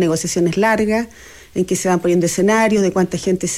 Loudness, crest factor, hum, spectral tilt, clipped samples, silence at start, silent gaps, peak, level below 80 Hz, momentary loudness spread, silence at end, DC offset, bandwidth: -17 LUFS; 12 dB; none; -5 dB/octave; under 0.1%; 0 s; none; -4 dBFS; -46 dBFS; 7 LU; 0 s; under 0.1%; 15.5 kHz